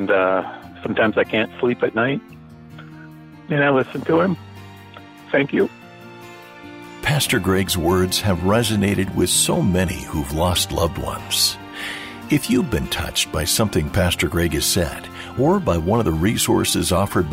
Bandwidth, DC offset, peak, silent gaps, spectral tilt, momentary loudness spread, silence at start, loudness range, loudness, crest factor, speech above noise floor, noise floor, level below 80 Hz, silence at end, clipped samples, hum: 16.5 kHz; under 0.1%; -6 dBFS; none; -4 dB/octave; 20 LU; 0 s; 4 LU; -19 LUFS; 14 dB; 22 dB; -41 dBFS; -38 dBFS; 0 s; under 0.1%; none